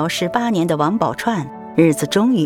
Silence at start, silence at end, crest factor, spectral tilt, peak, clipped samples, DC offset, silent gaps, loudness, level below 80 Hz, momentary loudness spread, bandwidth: 0 s; 0 s; 16 dB; -5.5 dB/octave; -2 dBFS; under 0.1%; under 0.1%; none; -18 LUFS; -54 dBFS; 6 LU; 17.5 kHz